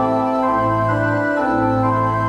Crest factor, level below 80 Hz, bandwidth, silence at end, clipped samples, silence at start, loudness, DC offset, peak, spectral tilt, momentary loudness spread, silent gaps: 12 dB; -42 dBFS; 9.8 kHz; 0 s; under 0.1%; 0 s; -18 LUFS; under 0.1%; -6 dBFS; -8.5 dB/octave; 1 LU; none